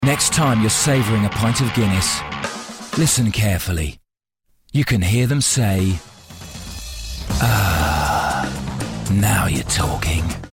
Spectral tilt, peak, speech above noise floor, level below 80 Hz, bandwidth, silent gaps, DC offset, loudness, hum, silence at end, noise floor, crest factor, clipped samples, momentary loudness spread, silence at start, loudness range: -4 dB/octave; -4 dBFS; 51 dB; -34 dBFS; 16.5 kHz; none; under 0.1%; -18 LUFS; none; 0.05 s; -68 dBFS; 14 dB; under 0.1%; 13 LU; 0 s; 3 LU